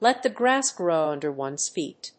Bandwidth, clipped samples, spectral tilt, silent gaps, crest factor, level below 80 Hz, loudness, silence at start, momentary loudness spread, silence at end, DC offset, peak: 8.8 kHz; under 0.1%; -2.5 dB/octave; none; 18 dB; -78 dBFS; -25 LUFS; 0 s; 8 LU; 0.1 s; under 0.1%; -6 dBFS